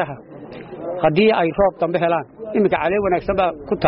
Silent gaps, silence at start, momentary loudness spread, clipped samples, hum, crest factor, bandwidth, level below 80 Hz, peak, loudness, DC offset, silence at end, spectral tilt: none; 0 s; 18 LU; under 0.1%; none; 14 dB; 5.6 kHz; -44 dBFS; -6 dBFS; -19 LUFS; under 0.1%; 0 s; -4.5 dB/octave